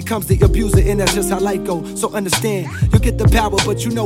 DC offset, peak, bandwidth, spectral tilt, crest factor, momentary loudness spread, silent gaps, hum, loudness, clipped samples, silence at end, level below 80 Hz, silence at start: under 0.1%; 0 dBFS; 16.5 kHz; -5 dB/octave; 14 dB; 7 LU; none; none; -16 LUFS; under 0.1%; 0 s; -22 dBFS; 0 s